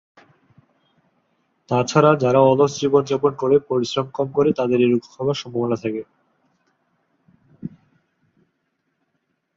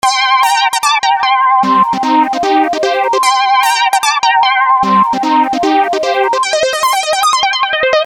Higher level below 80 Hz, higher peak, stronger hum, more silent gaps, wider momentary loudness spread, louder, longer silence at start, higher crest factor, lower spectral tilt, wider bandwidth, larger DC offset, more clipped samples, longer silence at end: second, -62 dBFS vs -54 dBFS; about the same, -2 dBFS vs 0 dBFS; neither; neither; first, 13 LU vs 3 LU; second, -19 LUFS vs -11 LUFS; first, 1.7 s vs 0.05 s; first, 20 dB vs 10 dB; first, -6.5 dB/octave vs -2 dB/octave; second, 7.6 kHz vs 19.5 kHz; neither; neither; first, 1.9 s vs 0 s